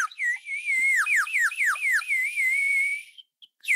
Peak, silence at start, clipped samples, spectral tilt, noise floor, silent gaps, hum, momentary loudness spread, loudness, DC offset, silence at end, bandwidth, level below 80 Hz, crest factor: -14 dBFS; 0 s; under 0.1%; 5.5 dB/octave; -53 dBFS; none; none; 6 LU; -23 LUFS; under 0.1%; 0 s; 16 kHz; under -90 dBFS; 12 dB